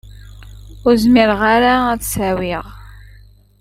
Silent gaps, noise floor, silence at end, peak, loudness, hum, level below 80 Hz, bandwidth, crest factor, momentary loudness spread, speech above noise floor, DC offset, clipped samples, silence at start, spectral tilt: none; -44 dBFS; 0.75 s; 0 dBFS; -14 LUFS; 50 Hz at -35 dBFS; -36 dBFS; 16.5 kHz; 16 dB; 12 LU; 30 dB; under 0.1%; under 0.1%; 0.05 s; -4.5 dB/octave